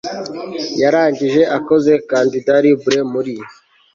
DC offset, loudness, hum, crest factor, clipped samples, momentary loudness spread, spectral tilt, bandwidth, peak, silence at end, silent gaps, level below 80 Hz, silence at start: under 0.1%; -15 LUFS; none; 14 dB; under 0.1%; 12 LU; -5.5 dB/octave; 7.6 kHz; -2 dBFS; 0.4 s; none; -58 dBFS; 0.05 s